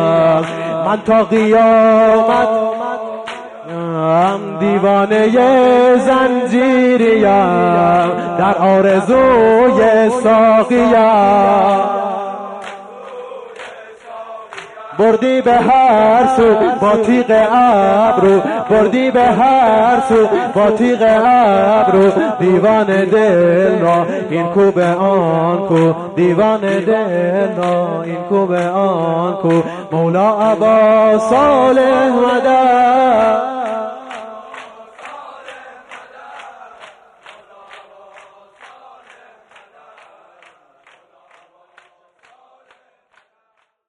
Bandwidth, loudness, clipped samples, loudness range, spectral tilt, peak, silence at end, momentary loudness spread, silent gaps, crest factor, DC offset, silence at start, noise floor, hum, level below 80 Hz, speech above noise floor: 10.5 kHz; -12 LUFS; under 0.1%; 5 LU; -7 dB/octave; -2 dBFS; 7.05 s; 18 LU; none; 10 dB; under 0.1%; 0 s; -64 dBFS; none; -48 dBFS; 53 dB